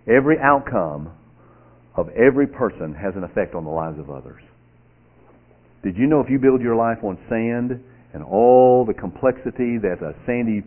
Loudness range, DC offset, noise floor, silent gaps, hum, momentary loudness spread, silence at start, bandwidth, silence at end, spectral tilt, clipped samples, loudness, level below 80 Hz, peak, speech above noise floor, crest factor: 9 LU; under 0.1%; -53 dBFS; none; 60 Hz at -50 dBFS; 15 LU; 0.05 s; 3.2 kHz; 0.05 s; -12 dB/octave; under 0.1%; -19 LUFS; -48 dBFS; 0 dBFS; 34 dB; 20 dB